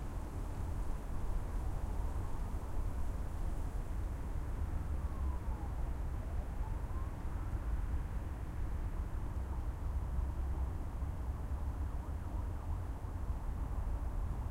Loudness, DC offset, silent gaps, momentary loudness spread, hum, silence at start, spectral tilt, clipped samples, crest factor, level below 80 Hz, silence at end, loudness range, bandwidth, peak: -42 LUFS; under 0.1%; none; 3 LU; none; 0 s; -7.5 dB/octave; under 0.1%; 12 dB; -38 dBFS; 0 s; 1 LU; 15.5 kHz; -26 dBFS